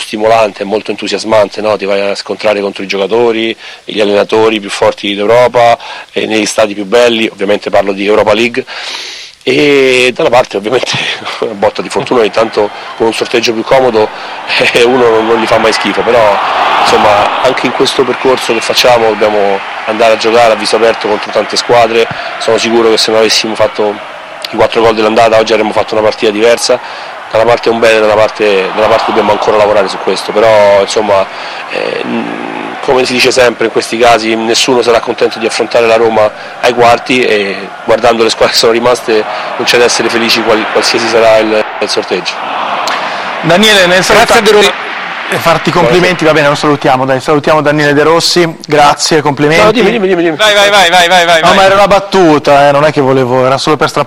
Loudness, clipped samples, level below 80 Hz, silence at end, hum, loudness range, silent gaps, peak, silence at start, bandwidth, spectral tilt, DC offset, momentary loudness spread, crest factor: -8 LUFS; 0.4%; -40 dBFS; 0 s; none; 4 LU; none; 0 dBFS; 0 s; 16.5 kHz; -3.5 dB/octave; under 0.1%; 9 LU; 8 dB